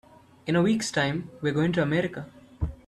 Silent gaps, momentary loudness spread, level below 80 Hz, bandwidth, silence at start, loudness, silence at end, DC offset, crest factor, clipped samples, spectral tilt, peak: none; 14 LU; -44 dBFS; 12.5 kHz; 0.45 s; -26 LUFS; 0.15 s; under 0.1%; 16 dB; under 0.1%; -5.5 dB/octave; -10 dBFS